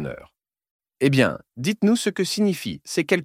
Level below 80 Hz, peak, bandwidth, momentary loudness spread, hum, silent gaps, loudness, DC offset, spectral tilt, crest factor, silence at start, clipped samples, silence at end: -60 dBFS; -2 dBFS; 16 kHz; 10 LU; none; 0.71-0.80 s; -22 LUFS; under 0.1%; -5 dB/octave; 20 dB; 0 s; under 0.1%; 0 s